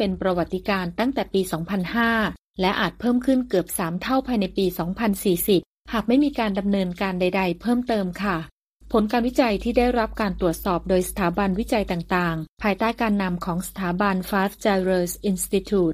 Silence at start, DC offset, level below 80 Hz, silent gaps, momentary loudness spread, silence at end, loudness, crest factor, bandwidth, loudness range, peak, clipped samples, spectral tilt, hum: 0 s; under 0.1%; -42 dBFS; 2.39-2.54 s, 5.66-5.84 s, 8.53-8.80 s, 12.49-12.57 s; 5 LU; 0 s; -23 LUFS; 16 dB; 15.5 kHz; 1 LU; -6 dBFS; under 0.1%; -5.5 dB/octave; none